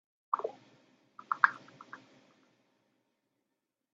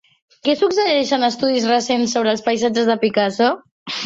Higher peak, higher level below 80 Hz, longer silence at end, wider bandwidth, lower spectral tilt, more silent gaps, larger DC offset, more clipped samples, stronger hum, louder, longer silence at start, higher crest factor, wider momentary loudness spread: second, -6 dBFS vs -2 dBFS; second, under -90 dBFS vs -62 dBFS; first, 2 s vs 0 s; about the same, 7.6 kHz vs 7.8 kHz; second, 0 dB/octave vs -3.5 dB/octave; second, none vs 3.71-3.86 s; neither; neither; neither; second, -32 LUFS vs -18 LUFS; about the same, 0.35 s vs 0.45 s; first, 34 dB vs 14 dB; first, 23 LU vs 4 LU